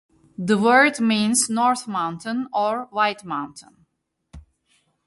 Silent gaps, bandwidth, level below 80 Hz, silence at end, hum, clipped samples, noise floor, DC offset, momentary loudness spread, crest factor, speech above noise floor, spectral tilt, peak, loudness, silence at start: none; 12 kHz; -58 dBFS; 0.65 s; none; under 0.1%; -72 dBFS; under 0.1%; 14 LU; 18 dB; 51 dB; -3.5 dB/octave; -4 dBFS; -21 LUFS; 0.4 s